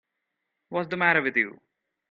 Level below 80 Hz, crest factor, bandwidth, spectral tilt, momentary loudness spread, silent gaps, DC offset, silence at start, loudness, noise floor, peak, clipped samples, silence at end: -72 dBFS; 22 dB; 7 kHz; -7.5 dB/octave; 11 LU; none; under 0.1%; 0.7 s; -25 LUFS; -81 dBFS; -6 dBFS; under 0.1%; 0.6 s